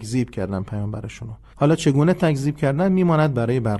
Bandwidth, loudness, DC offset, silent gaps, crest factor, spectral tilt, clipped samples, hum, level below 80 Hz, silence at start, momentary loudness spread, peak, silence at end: 12 kHz; -20 LUFS; under 0.1%; none; 16 dB; -7.5 dB/octave; under 0.1%; none; -46 dBFS; 0 s; 14 LU; -4 dBFS; 0 s